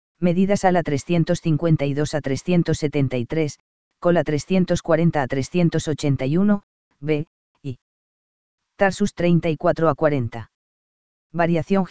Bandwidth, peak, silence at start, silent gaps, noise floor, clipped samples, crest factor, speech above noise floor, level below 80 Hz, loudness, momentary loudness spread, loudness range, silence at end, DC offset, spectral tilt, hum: 8 kHz; -2 dBFS; 0.15 s; 3.60-3.91 s, 6.63-6.91 s, 7.27-7.55 s, 7.82-8.58 s, 10.54-11.30 s; under -90 dBFS; under 0.1%; 18 dB; over 70 dB; -48 dBFS; -21 LUFS; 9 LU; 4 LU; 0 s; 2%; -7 dB/octave; none